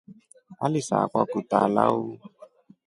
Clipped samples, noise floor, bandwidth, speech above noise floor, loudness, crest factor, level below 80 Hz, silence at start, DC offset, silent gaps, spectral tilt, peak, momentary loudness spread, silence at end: under 0.1%; -52 dBFS; 11.5 kHz; 28 dB; -24 LUFS; 24 dB; -68 dBFS; 0.1 s; under 0.1%; none; -6.5 dB/octave; -4 dBFS; 10 LU; 0.4 s